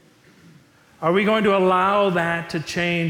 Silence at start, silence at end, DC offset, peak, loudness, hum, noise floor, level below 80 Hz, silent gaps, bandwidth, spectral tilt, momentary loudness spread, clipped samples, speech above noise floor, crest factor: 1 s; 0 s; under 0.1%; -8 dBFS; -20 LUFS; none; -52 dBFS; -58 dBFS; none; 17 kHz; -6 dB/octave; 8 LU; under 0.1%; 33 dB; 14 dB